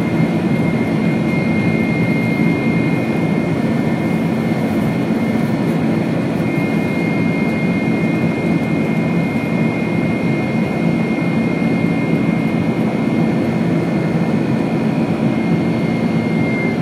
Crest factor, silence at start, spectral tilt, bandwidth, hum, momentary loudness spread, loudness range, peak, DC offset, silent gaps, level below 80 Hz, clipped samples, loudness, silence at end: 14 dB; 0 s; -8 dB/octave; 13.5 kHz; none; 1 LU; 1 LU; -2 dBFS; under 0.1%; none; -46 dBFS; under 0.1%; -17 LUFS; 0 s